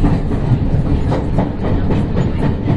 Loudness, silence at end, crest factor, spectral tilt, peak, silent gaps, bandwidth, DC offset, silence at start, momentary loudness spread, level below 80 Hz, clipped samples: -17 LUFS; 0 s; 12 dB; -9.5 dB/octave; -2 dBFS; none; 8.2 kHz; under 0.1%; 0 s; 2 LU; -20 dBFS; under 0.1%